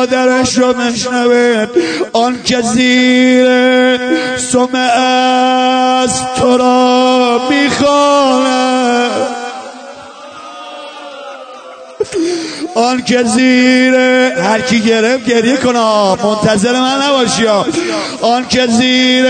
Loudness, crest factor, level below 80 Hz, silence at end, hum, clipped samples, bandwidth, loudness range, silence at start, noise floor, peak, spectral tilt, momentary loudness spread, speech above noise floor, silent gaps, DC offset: -10 LUFS; 10 dB; -48 dBFS; 0 s; none; under 0.1%; 9.4 kHz; 8 LU; 0 s; -31 dBFS; 0 dBFS; -3.5 dB/octave; 19 LU; 21 dB; none; under 0.1%